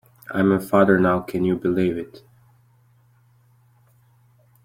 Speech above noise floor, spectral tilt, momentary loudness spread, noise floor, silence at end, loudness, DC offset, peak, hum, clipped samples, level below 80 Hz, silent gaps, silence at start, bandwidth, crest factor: 38 dB; -8 dB/octave; 13 LU; -57 dBFS; 2.45 s; -20 LUFS; under 0.1%; -2 dBFS; none; under 0.1%; -58 dBFS; none; 0.3 s; 16 kHz; 20 dB